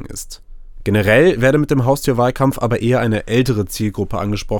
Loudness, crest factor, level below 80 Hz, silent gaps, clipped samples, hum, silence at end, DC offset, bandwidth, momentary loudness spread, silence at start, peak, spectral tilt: -16 LUFS; 16 dB; -34 dBFS; none; under 0.1%; none; 0 s; under 0.1%; 18 kHz; 10 LU; 0 s; 0 dBFS; -6 dB/octave